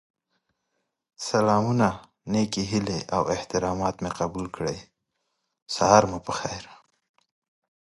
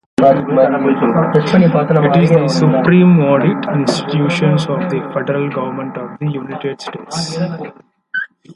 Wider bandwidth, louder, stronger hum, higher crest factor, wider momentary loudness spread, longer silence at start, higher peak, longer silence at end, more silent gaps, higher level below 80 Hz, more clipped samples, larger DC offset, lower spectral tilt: about the same, 11.5 kHz vs 11.5 kHz; second, -25 LUFS vs -14 LUFS; neither; first, 26 dB vs 14 dB; about the same, 14 LU vs 13 LU; first, 1.2 s vs 0.2 s; about the same, -2 dBFS vs 0 dBFS; first, 1.1 s vs 0.05 s; first, 5.62-5.66 s vs none; about the same, -52 dBFS vs -54 dBFS; neither; neither; second, -5 dB/octave vs -7 dB/octave